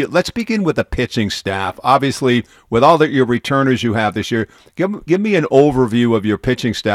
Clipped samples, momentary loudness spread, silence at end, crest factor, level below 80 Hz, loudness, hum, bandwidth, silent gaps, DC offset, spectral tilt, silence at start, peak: under 0.1%; 8 LU; 0 s; 16 dB; -40 dBFS; -16 LUFS; none; 15 kHz; none; under 0.1%; -6 dB/octave; 0 s; 0 dBFS